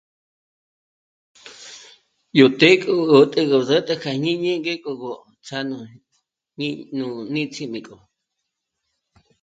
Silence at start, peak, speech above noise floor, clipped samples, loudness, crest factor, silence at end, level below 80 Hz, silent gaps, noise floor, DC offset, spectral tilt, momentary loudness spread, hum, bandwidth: 1.45 s; 0 dBFS; 60 dB; under 0.1%; -19 LUFS; 22 dB; 1.5 s; -66 dBFS; none; -79 dBFS; under 0.1%; -5.5 dB/octave; 20 LU; none; 9 kHz